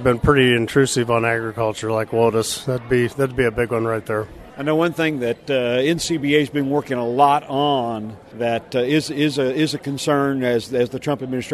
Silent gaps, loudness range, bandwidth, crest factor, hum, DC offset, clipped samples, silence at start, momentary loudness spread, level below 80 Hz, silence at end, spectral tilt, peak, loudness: none; 2 LU; 13.5 kHz; 18 dB; none; under 0.1%; under 0.1%; 0 s; 8 LU; -44 dBFS; 0 s; -5 dB/octave; -2 dBFS; -20 LUFS